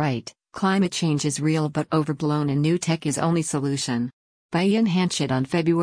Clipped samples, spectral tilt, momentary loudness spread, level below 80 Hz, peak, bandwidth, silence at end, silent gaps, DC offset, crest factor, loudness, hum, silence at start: under 0.1%; -5.5 dB/octave; 5 LU; -60 dBFS; -10 dBFS; 10.5 kHz; 0 s; 4.13-4.49 s; under 0.1%; 14 dB; -23 LUFS; none; 0 s